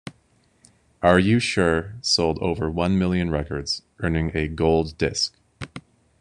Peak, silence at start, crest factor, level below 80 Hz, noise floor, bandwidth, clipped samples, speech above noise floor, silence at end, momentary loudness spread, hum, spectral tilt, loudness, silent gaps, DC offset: -2 dBFS; 0.05 s; 20 dB; -40 dBFS; -62 dBFS; 11 kHz; under 0.1%; 40 dB; 0.4 s; 18 LU; none; -5 dB/octave; -22 LUFS; none; under 0.1%